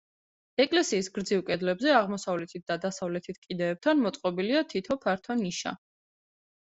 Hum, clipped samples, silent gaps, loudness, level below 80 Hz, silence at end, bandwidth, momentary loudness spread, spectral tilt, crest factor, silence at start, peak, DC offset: none; under 0.1%; 3.38-3.42 s; -29 LUFS; -68 dBFS; 0.95 s; 8.2 kHz; 10 LU; -4.5 dB/octave; 20 dB; 0.6 s; -10 dBFS; under 0.1%